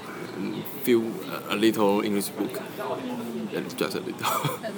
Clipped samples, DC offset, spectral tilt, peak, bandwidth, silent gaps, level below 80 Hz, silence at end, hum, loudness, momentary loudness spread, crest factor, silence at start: under 0.1%; under 0.1%; -5 dB/octave; -8 dBFS; 19.5 kHz; none; -74 dBFS; 0 s; none; -27 LUFS; 9 LU; 20 dB; 0 s